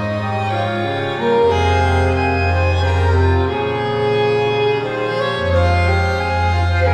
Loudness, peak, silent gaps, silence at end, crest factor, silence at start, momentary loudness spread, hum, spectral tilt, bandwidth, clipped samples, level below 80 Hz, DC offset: -17 LUFS; -4 dBFS; none; 0 s; 12 dB; 0 s; 5 LU; none; -6.5 dB/octave; 9 kHz; under 0.1%; -30 dBFS; under 0.1%